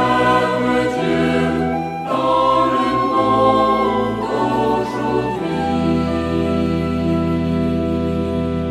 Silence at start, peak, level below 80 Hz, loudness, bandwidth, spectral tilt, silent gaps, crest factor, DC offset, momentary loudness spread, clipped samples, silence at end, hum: 0 s; -2 dBFS; -38 dBFS; -18 LUFS; 13 kHz; -7 dB/octave; none; 16 dB; under 0.1%; 6 LU; under 0.1%; 0 s; none